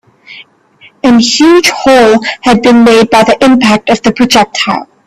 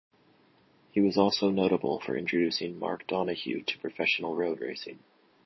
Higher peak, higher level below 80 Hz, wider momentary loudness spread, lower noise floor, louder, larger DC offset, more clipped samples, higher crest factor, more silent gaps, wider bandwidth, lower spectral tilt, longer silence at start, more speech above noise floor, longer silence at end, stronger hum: first, 0 dBFS vs -8 dBFS; first, -40 dBFS vs -68 dBFS; second, 6 LU vs 10 LU; second, -41 dBFS vs -63 dBFS; first, -6 LUFS vs -29 LUFS; neither; first, 0.3% vs under 0.1%; second, 8 dB vs 22 dB; neither; first, 15 kHz vs 6.2 kHz; second, -4 dB/octave vs -5.5 dB/octave; second, 0.3 s vs 0.95 s; about the same, 35 dB vs 34 dB; second, 0.25 s vs 0.5 s; neither